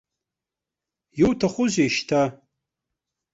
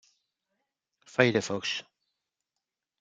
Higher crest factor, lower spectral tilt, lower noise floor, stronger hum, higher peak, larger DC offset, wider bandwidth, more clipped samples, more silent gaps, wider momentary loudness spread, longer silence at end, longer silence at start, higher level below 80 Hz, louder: second, 18 dB vs 28 dB; about the same, -5 dB/octave vs -4.5 dB/octave; about the same, -88 dBFS vs -87 dBFS; neither; about the same, -6 dBFS vs -6 dBFS; neither; second, 8 kHz vs 9.4 kHz; neither; neither; second, 5 LU vs 9 LU; second, 1 s vs 1.2 s; about the same, 1.15 s vs 1.2 s; first, -54 dBFS vs -72 dBFS; first, -22 LUFS vs -28 LUFS